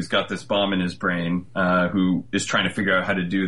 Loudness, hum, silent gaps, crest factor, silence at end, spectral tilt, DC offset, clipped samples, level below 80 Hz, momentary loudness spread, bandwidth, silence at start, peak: -22 LUFS; none; none; 14 dB; 0 s; -5 dB/octave; 0.6%; under 0.1%; -56 dBFS; 4 LU; 11.5 kHz; 0 s; -8 dBFS